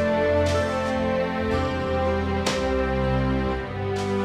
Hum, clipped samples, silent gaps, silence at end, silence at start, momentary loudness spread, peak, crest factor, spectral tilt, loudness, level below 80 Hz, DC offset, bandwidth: none; under 0.1%; none; 0 s; 0 s; 5 LU; -8 dBFS; 16 dB; -6 dB/octave; -24 LUFS; -34 dBFS; under 0.1%; 13.5 kHz